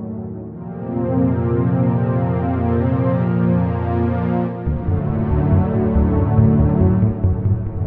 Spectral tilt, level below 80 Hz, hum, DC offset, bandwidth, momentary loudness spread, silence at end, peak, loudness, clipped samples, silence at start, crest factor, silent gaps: -13 dB/octave; -28 dBFS; none; under 0.1%; 3.7 kHz; 8 LU; 0 s; -2 dBFS; -18 LUFS; under 0.1%; 0 s; 14 dB; none